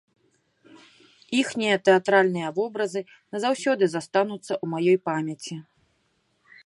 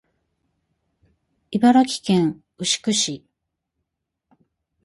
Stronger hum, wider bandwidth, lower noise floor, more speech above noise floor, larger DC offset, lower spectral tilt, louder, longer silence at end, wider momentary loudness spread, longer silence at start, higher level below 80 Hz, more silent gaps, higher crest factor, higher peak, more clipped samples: neither; about the same, 11.5 kHz vs 11.5 kHz; second, -70 dBFS vs -80 dBFS; second, 46 dB vs 61 dB; neither; about the same, -5 dB/octave vs -4 dB/octave; second, -24 LUFS vs -20 LUFS; second, 1.05 s vs 1.65 s; about the same, 14 LU vs 12 LU; second, 1.3 s vs 1.5 s; second, -76 dBFS vs -64 dBFS; neither; about the same, 20 dB vs 18 dB; about the same, -6 dBFS vs -4 dBFS; neither